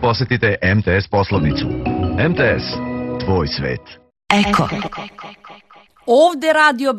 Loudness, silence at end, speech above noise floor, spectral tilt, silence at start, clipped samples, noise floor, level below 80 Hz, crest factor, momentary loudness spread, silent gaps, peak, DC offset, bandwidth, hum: -17 LUFS; 0 s; 31 dB; -6 dB/octave; 0 s; under 0.1%; -48 dBFS; -36 dBFS; 18 dB; 15 LU; none; 0 dBFS; under 0.1%; 13.5 kHz; none